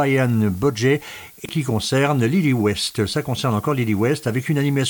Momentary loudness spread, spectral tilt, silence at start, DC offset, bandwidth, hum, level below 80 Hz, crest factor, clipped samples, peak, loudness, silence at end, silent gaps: 5 LU; -6 dB/octave; 0 s; under 0.1%; 19 kHz; none; -52 dBFS; 14 dB; under 0.1%; -6 dBFS; -20 LUFS; 0 s; none